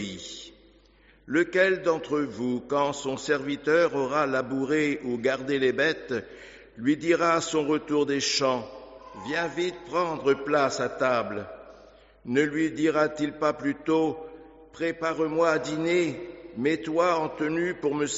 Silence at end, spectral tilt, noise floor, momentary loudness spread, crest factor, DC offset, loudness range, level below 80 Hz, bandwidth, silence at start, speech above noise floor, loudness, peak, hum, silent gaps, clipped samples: 0 s; -3.5 dB/octave; -58 dBFS; 15 LU; 18 dB; under 0.1%; 2 LU; -62 dBFS; 8 kHz; 0 s; 32 dB; -26 LUFS; -8 dBFS; none; none; under 0.1%